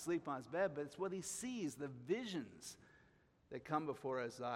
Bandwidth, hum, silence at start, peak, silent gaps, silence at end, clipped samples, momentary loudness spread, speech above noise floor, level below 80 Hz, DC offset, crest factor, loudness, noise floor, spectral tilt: 16 kHz; none; 0 s; -26 dBFS; none; 0 s; under 0.1%; 12 LU; 29 dB; -80 dBFS; under 0.1%; 20 dB; -44 LUFS; -72 dBFS; -4.5 dB/octave